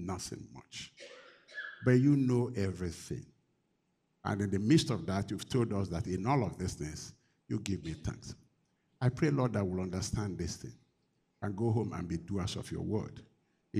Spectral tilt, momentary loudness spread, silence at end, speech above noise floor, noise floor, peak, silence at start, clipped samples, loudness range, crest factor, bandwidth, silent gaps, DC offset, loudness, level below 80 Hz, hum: -6.5 dB/octave; 18 LU; 0 s; 45 dB; -78 dBFS; -14 dBFS; 0 s; under 0.1%; 4 LU; 22 dB; 14 kHz; none; under 0.1%; -34 LUFS; -56 dBFS; none